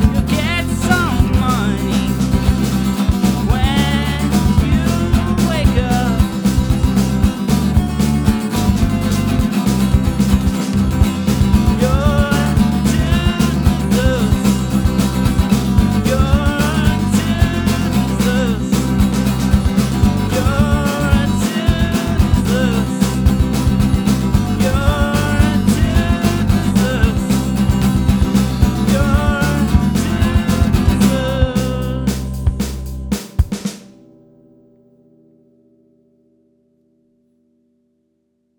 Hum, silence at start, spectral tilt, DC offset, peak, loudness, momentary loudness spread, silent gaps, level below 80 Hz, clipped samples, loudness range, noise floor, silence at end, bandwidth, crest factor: none; 0 s; -6 dB/octave; under 0.1%; 0 dBFS; -15 LUFS; 3 LU; none; -22 dBFS; under 0.1%; 2 LU; -65 dBFS; 4.75 s; over 20 kHz; 14 dB